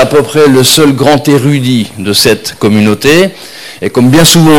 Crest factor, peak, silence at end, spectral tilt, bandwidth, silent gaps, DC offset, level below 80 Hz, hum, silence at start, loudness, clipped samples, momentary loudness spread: 6 dB; 0 dBFS; 0 s; -4.5 dB/octave; over 20 kHz; none; under 0.1%; -38 dBFS; none; 0 s; -7 LUFS; 0.8%; 9 LU